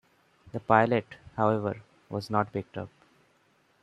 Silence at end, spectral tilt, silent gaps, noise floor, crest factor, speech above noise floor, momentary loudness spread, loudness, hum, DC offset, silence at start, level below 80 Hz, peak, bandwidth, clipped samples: 0.95 s; -8 dB/octave; none; -67 dBFS; 24 dB; 39 dB; 18 LU; -28 LUFS; none; under 0.1%; 0.55 s; -66 dBFS; -6 dBFS; 12 kHz; under 0.1%